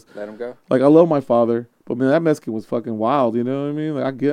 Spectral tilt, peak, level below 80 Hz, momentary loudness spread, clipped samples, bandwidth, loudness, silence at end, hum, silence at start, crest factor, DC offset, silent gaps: -8 dB/octave; 0 dBFS; -72 dBFS; 16 LU; under 0.1%; 11 kHz; -18 LUFS; 0 s; none; 0.15 s; 18 dB; under 0.1%; none